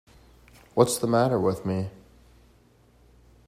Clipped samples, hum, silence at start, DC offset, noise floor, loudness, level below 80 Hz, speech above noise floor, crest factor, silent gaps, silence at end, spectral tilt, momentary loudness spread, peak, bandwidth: under 0.1%; 60 Hz at -50 dBFS; 0.75 s; under 0.1%; -59 dBFS; -25 LUFS; -58 dBFS; 35 dB; 24 dB; none; 1.55 s; -5.5 dB/octave; 10 LU; -4 dBFS; 16 kHz